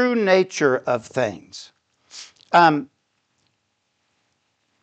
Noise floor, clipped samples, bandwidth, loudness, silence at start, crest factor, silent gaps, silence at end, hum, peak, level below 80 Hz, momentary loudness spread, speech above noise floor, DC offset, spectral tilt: -72 dBFS; under 0.1%; 8.8 kHz; -19 LUFS; 0 s; 20 dB; none; 2 s; none; -2 dBFS; -70 dBFS; 24 LU; 53 dB; under 0.1%; -5 dB/octave